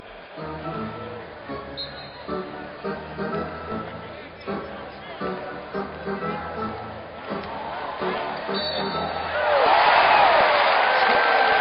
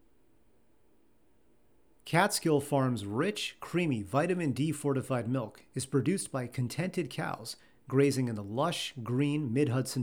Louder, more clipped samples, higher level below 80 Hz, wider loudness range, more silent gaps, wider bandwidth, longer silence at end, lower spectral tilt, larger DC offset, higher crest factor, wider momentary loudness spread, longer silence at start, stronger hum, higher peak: first, -23 LUFS vs -31 LUFS; neither; first, -52 dBFS vs -70 dBFS; first, 13 LU vs 3 LU; neither; second, 5.4 kHz vs 19.5 kHz; about the same, 0 s vs 0 s; second, -1 dB/octave vs -5.5 dB/octave; neither; about the same, 18 dB vs 22 dB; first, 20 LU vs 9 LU; second, 0 s vs 2.05 s; neither; first, -6 dBFS vs -10 dBFS